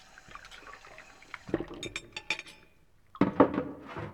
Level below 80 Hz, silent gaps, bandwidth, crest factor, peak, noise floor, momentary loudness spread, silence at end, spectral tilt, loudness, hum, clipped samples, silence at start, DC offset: -58 dBFS; none; 12 kHz; 28 dB; -6 dBFS; -64 dBFS; 23 LU; 0 s; -5.5 dB/octave; -32 LUFS; none; under 0.1%; 0.3 s; under 0.1%